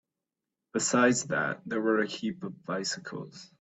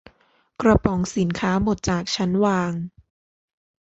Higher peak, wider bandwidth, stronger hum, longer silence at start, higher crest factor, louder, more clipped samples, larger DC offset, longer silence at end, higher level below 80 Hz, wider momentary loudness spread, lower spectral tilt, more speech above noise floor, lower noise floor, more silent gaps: second, -10 dBFS vs -2 dBFS; about the same, 8.4 kHz vs 8 kHz; neither; first, 0.75 s vs 0.6 s; about the same, 22 dB vs 20 dB; second, -29 LUFS vs -22 LUFS; neither; neither; second, 0.15 s vs 1.05 s; second, -74 dBFS vs -40 dBFS; first, 16 LU vs 7 LU; second, -3.5 dB/octave vs -6 dB/octave; first, 58 dB vs 41 dB; first, -88 dBFS vs -62 dBFS; neither